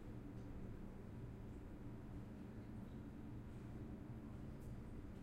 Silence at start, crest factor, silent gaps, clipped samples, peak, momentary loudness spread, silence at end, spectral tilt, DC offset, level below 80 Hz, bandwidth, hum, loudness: 0 s; 12 dB; none; under 0.1%; -40 dBFS; 2 LU; 0 s; -8.5 dB/octave; under 0.1%; -58 dBFS; 16 kHz; none; -54 LUFS